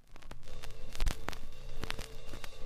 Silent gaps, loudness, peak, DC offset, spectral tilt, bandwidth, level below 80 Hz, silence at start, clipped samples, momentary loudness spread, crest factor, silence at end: none; -44 LUFS; -14 dBFS; under 0.1%; -3.5 dB/octave; 14 kHz; -38 dBFS; 0.1 s; under 0.1%; 12 LU; 20 dB; 0 s